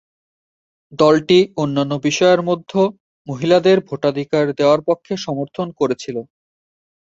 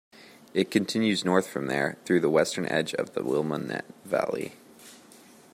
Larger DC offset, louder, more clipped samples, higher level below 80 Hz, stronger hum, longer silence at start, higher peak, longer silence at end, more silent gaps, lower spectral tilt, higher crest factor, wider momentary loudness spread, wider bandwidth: neither; first, -17 LUFS vs -27 LUFS; neither; first, -60 dBFS vs -70 dBFS; neither; first, 0.9 s vs 0.2 s; first, -2 dBFS vs -8 dBFS; first, 0.9 s vs 0.6 s; first, 3.00-3.25 s vs none; about the same, -5.5 dB/octave vs -5 dB/octave; about the same, 16 dB vs 20 dB; about the same, 11 LU vs 9 LU; second, 7.8 kHz vs 16 kHz